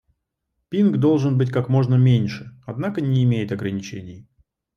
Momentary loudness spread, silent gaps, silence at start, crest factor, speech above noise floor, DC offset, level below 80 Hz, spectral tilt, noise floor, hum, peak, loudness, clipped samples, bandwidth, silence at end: 17 LU; none; 0.7 s; 14 dB; 57 dB; under 0.1%; -58 dBFS; -8.5 dB/octave; -77 dBFS; none; -6 dBFS; -20 LUFS; under 0.1%; 6.6 kHz; 0.55 s